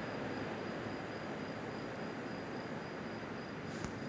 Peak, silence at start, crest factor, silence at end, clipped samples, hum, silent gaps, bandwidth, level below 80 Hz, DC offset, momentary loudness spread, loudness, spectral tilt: -24 dBFS; 0 s; 18 dB; 0 s; under 0.1%; none; none; 8 kHz; -64 dBFS; under 0.1%; 3 LU; -43 LUFS; -6 dB/octave